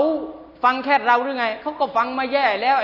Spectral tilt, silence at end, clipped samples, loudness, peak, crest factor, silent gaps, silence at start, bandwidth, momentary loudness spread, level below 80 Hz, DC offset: -4.5 dB/octave; 0 s; under 0.1%; -20 LUFS; -4 dBFS; 16 dB; none; 0 s; 6 kHz; 7 LU; -60 dBFS; under 0.1%